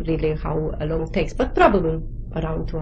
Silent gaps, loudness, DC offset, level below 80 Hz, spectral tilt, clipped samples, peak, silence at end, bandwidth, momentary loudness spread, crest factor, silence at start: none; -22 LUFS; under 0.1%; -30 dBFS; -7.5 dB/octave; under 0.1%; -2 dBFS; 0 s; 9.4 kHz; 11 LU; 20 dB; 0 s